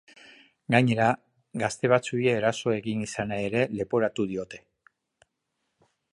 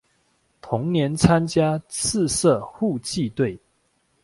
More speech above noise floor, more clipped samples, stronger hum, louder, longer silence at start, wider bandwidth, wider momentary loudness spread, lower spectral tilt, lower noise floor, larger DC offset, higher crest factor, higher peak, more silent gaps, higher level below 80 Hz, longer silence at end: first, 54 dB vs 46 dB; neither; neither; second, -26 LUFS vs -22 LUFS; about the same, 0.7 s vs 0.65 s; about the same, 11.5 kHz vs 11.5 kHz; first, 12 LU vs 8 LU; about the same, -6 dB/octave vs -5 dB/octave; first, -79 dBFS vs -67 dBFS; neither; about the same, 24 dB vs 22 dB; about the same, -4 dBFS vs -2 dBFS; neither; second, -62 dBFS vs -48 dBFS; first, 1.55 s vs 0.65 s